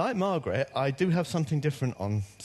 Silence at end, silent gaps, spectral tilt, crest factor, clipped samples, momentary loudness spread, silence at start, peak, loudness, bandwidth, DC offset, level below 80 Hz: 0 s; none; -7 dB/octave; 16 dB; under 0.1%; 5 LU; 0 s; -14 dBFS; -29 LUFS; 12.5 kHz; under 0.1%; -62 dBFS